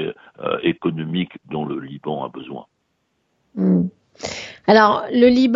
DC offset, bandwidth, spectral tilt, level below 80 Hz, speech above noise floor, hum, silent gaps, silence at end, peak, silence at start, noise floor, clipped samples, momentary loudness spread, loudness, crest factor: under 0.1%; 7.6 kHz; -6.5 dB/octave; -56 dBFS; 51 dB; none; none; 0 s; 0 dBFS; 0 s; -70 dBFS; under 0.1%; 18 LU; -20 LUFS; 20 dB